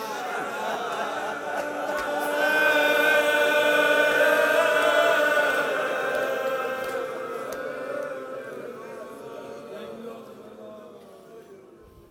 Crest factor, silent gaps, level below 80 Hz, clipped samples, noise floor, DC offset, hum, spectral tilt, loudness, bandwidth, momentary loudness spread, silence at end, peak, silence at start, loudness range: 18 dB; none; -68 dBFS; under 0.1%; -50 dBFS; under 0.1%; none; -2 dB/octave; -23 LUFS; 16.5 kHz; 20 LU; 0.5 s; -8 dBFS; 0 s; 19 LU